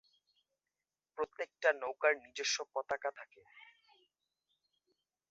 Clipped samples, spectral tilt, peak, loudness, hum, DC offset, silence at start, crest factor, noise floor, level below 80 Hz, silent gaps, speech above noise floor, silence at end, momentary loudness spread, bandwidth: under 0.1%; 2.5 dB/octave; -16 dBFS; -36 LUFS; none; under 0.1%; 1.15 s; 26 dB; under -90 dBFS; -84 dBFS; none; over 53 dB; 1.65 s; 16 LU; 7.6 kHz